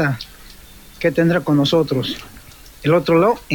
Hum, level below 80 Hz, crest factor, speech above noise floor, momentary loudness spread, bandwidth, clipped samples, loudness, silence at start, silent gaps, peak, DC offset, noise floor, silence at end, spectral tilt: none; -46 dBFS; 16 dB; 25 dB; 13 LU; 18 kHz; under 0.1%; -17 LUFS; 0 s; none; -2 dBFS; under 0.1%; -41 dBFS; 0 s; -6.5 dB/octave